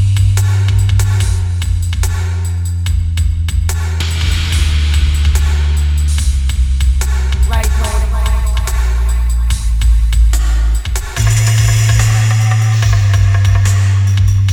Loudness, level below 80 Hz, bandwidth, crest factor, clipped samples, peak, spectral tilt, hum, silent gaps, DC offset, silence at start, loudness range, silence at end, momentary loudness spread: -14 LUFS; -14 dBFS; 16.5 kHz; 12 dB; under 0.1%; 0 dBFS; -4.5 dB/octave; none; none; under 0.1%; 0 s; 4 LU; 0 s; 5 LU